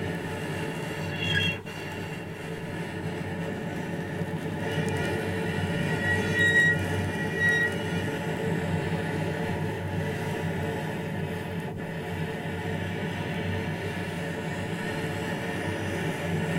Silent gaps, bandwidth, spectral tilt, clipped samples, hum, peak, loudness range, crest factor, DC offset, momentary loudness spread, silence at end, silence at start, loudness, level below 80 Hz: none; 16.5 kHz; -5.5 dB/octave; under 0.1%; none; -12 dBFS; 7 LU; 18 dB; under 0.1%; 10 LU; 0 s; 0 s; -29 LUFS; -56 dBFS